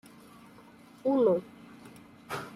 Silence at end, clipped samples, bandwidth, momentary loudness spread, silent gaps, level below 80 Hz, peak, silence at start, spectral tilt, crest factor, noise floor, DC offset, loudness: 0 s; under 0.1%; 15 kHz; 26 LU; none; -72 dBFS; -12 dBFS; 1.05 s; -7 dB/octave; 20 dB; -54 dBFS; under 0.1%; -29 LUFS